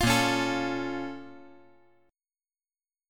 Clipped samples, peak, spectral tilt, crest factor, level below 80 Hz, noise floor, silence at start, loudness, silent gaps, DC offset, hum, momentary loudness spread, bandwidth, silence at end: under 0.1%; -12 dBFS; -4 dB/octave; 20 dB; -50 dBFS; under -90 dBFS; 0 s; -28 LUFS; none; under 0.1%; none; 20 LU; 17.5 kHz; 1.65 s